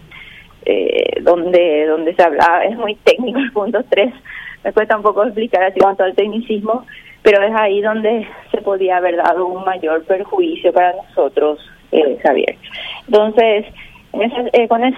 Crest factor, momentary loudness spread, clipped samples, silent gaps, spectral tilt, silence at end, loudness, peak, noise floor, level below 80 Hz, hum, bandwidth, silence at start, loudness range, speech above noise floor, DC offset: 14 dB; 9 LU; under 0.1%; none; -5.5 dB/octave; 0 s; -15 LUFS; 0 dBFS; -38 dBFS; -52 dBFS; none; 10 kHz; 0.1 s; 2 LU; 24 dB; under 0.1%